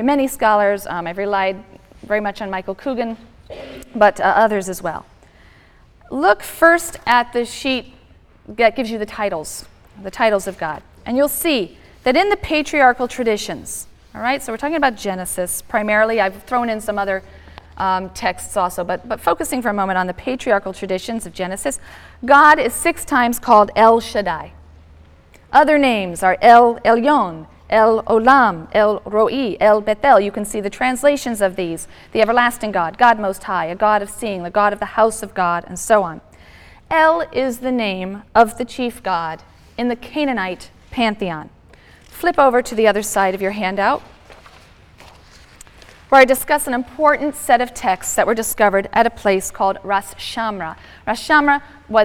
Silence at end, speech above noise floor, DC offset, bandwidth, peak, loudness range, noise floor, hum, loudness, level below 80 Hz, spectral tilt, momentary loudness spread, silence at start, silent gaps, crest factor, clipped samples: 0 s; 32 dB; under 0.1%; 18 kHz; 0 dBFS; 7 LU; -48 dBFS; none; -17 LUFS; -46 dBFS; -3.5 dB/octave; 13 LU; 0 s; none; 16 dB; under 0.1%